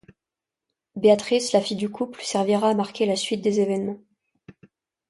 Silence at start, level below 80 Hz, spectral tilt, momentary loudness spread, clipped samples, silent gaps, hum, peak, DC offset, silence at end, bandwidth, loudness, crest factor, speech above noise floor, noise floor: 0.95 s; -68 dBFS; -4.5 dB/octave; 10 LU; under 0.1%; none; none; -6 dBFS; under 0.1%; 0.6 s; 11.5 kHz; -23 LUFS; 18 dB; 66 dB; -88 dBFS